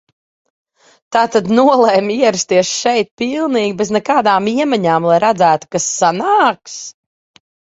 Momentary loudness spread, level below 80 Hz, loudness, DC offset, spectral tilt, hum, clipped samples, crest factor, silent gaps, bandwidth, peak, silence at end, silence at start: 7 LU; -58 dBFS; -13 LUFS; under 0.1%; -4 dB/octave; none; under 0.1%; 14 dB; 3.11-3.17 s; 8 kHz; 0 dBFS; 0.85 s; 1.1 s